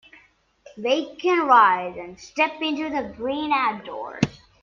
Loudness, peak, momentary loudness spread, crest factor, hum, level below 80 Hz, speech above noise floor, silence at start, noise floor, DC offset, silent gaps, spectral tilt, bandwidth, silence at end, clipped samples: -22 LUFS; -4 dBFS; 17 LU; 20 dB; none; -58 dBFS; 35 dB; 0.75 s; -58 dBFS; under 0.1%; none; -5 dB/octave; 7.4 kHz; 0.25 s; under 0.1%